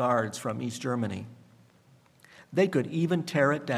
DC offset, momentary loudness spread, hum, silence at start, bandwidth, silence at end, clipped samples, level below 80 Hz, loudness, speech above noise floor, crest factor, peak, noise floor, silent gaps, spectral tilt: under 0.1%; 8 LU; none; 0 s; 15 kHz; 0 s; under 0.1%; -74 dBFS; -29 LUFS; 33 dB; 18 dB; -10 dBFS; -60 dBFS; none; -6 dB/octave